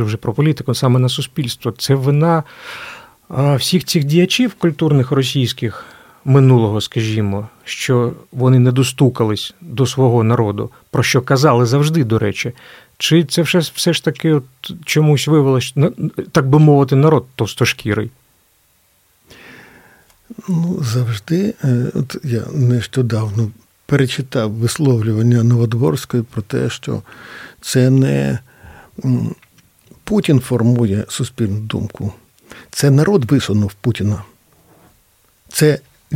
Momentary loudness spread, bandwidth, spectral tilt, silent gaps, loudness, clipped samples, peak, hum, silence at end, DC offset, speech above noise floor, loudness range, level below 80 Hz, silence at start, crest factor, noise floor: 13 LU; 16 kHz; -6 dB/octave; none; -16 LUFS; under 0.1%; 0 dBFS; none; 0 s; under 0.1%; 42 dB; 4 LU; -50 dBFS; 0 s; 16 dB; -57 dBFS